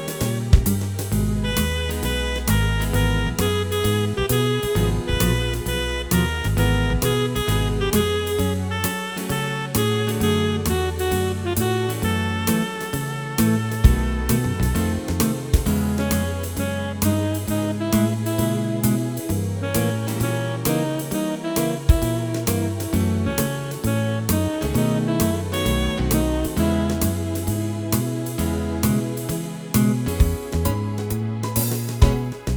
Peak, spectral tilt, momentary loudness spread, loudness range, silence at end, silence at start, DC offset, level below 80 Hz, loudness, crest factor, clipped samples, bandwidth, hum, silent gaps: 0 dBFS; -5.5 dB/octave; 5 LU; 2 LU; 0 s; 0 s; 0.1%; -28 dBFS; -22 LUFS; 20 dB; under 0.1%; over 20 kHz; none; none